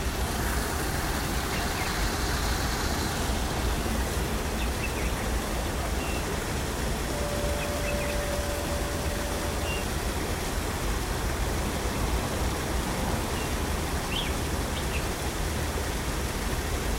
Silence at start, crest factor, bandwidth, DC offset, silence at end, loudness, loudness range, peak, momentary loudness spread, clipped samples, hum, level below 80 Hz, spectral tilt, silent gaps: 0 s; 14 dB; 16 kHz; under 0.1%; 0 s; -29 LUFS; 1 LU; -14 dBFS; 2 LU; under 0.1%; none; -32 dBFS; -4 dB/octave; none